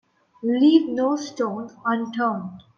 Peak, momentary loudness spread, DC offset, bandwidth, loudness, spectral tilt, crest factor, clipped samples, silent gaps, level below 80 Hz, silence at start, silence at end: -4 dBFS; 11 LU; under 0.1%; 7 kHz; -22 LUFS; -5.5 dB/octave; 18 dB; under 0.1%; none; -70 dBFS; 0.4 s; 0.15 s